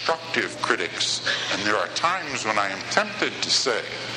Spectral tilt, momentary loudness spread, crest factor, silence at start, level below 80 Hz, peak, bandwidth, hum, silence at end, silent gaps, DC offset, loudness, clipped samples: -1.5 dB/octave; 4 LU; 20 dB; 0 s; -64 dBFS; -4 dBFS; 13 kHz; none; 0 s; none; under 0.1%; -23 LUFS; under 0.1%